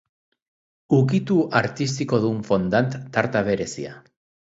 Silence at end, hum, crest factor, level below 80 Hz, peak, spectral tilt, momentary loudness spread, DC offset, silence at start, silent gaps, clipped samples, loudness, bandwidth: 0.55 s; none; 20 dB; -56 dBFS; -2 dBFS; -6.5 dB/octave; 6 LU; under 0.1%; 0.9 s; none; under 0.1%; -22 LUFS; 8 kHz